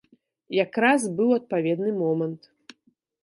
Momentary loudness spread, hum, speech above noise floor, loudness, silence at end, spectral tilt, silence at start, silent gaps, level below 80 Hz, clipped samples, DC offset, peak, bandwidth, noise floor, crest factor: 8 LU; none; 44 dB; -24 LUFS; 0.85 s; -5.5 dB/octave; 0.5 s; none; -78 dBFS; under 0.1%; under 0.1%; -6 dBFS; 11.5 kHz; -67 dBFS; 18 dB